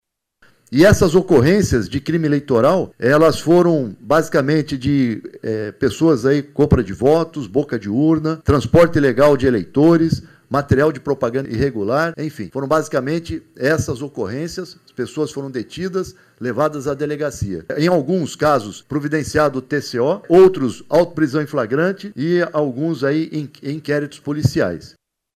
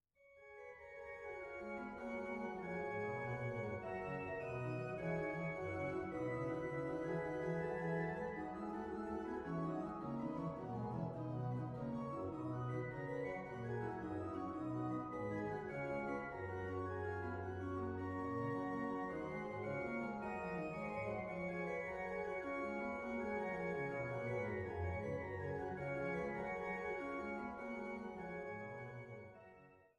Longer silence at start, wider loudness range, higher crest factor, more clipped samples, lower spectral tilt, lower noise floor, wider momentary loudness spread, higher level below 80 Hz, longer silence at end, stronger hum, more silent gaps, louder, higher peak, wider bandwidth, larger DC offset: first, 0.7 s vs 0.2 s; first, 7 LU vs 2 LU; about the same, 16 dB vs 14 dB; neither; second, -6.5 dB/octave vs -8.5 dB/octave; second, -55 dBFS vs -65 dBFS; first, 12 LU vs 6 LU; first, -40 dBFS vs -66 dBFS; first, 0.5 s vs 0.1 s; neither; neither; first, -17 LUFS vs -44 LUFS; first, -2 dBFS vs -30 dBFS; first, 15.5 kHz vs 11 kHz; neither